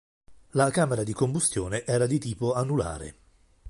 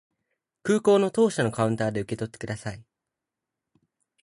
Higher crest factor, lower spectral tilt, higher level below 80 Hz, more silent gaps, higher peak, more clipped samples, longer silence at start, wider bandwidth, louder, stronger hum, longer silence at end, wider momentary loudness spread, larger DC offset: about the same, 20 dB vs 18 dB; about the same, -5.5 dB/octave vs -6 dB/octave; first, -50 dBFS vs -60 dBFS; neither; about the same, -8 dBFS vs -8 dBFS; neither; second, 0.3 s vs 0.65 s; about the same, 11.5 kHz vs 11.5 kHz; about the same, -26 LUFS vs -25 LUFS; neither; second, 0 s vs 1.45 s; second, 8 LU vs 14 LU; neither